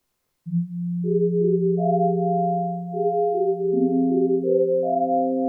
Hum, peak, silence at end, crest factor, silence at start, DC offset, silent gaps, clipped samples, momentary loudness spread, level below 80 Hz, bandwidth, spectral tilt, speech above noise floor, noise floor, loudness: none; -10 dBFS; 0 s; 12 dB; 0.45 s; under 0.1%; none; under 0.1%; 6 LU; -86 dBFS; 0.8 kHz; -14.5 dB/octave; 21 dB; -42 dBFS; -22 LUFS